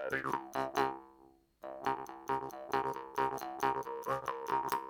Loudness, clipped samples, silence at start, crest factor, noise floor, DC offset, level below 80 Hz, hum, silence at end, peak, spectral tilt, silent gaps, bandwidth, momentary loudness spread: -37 LUFS; under 0.1%; 0 s; 22 dB; -64 dBFS; under 0.1%; -68 dBFS; none; 0 s; -16 dBFS; -4.5 dB/octave; none; 20 kHz; 5 LU